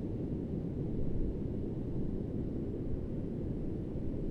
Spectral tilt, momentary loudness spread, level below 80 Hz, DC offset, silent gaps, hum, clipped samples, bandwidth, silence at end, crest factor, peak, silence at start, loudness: -11 dB/octave; 2 LU; -42 dBFS; under 0.1%; none; none; under 0.1%; 4.4 kHz; 0 s; 14 dB; -22 dBFS; 0 s; -38 LUFS